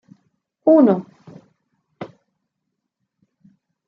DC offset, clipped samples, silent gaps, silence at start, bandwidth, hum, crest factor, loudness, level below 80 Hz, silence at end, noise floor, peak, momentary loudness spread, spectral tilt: under 0.1%; under 0.1%; none; 0.65 s; 5.2 kHz; none; 20 dB; -16 LUFS; -74 dBFS; 1.8 s; -78 dBFS; -2 dBFS; 25 LU; -10.5 dB/octave